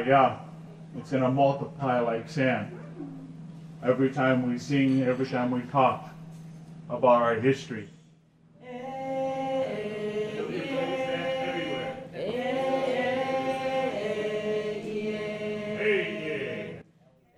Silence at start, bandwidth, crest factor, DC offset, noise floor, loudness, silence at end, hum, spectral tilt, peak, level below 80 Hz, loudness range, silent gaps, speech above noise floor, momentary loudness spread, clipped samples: 0 s; 11 kHz; 20 dB; under 0.1%; -61 dBFS; -28 LUFS; 0.55 s; none; -6.5 dB/octave; -8 dBFS; -66 dBFS; 4 LU; none; 36 dB; 18 LU; under 0.1%